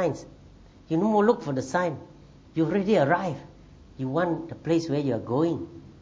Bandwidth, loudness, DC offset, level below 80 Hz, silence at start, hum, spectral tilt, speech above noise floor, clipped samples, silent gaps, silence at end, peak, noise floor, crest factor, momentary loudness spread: 8 kHz; -26 LUFS; under 0.1%; -56 dBFS; 0 s; none; -7 dB/octave; 25 dB; under 0.1%; none; 0.1 s; -8 dBFS; -51 dBFS; 18 dB; 13 LU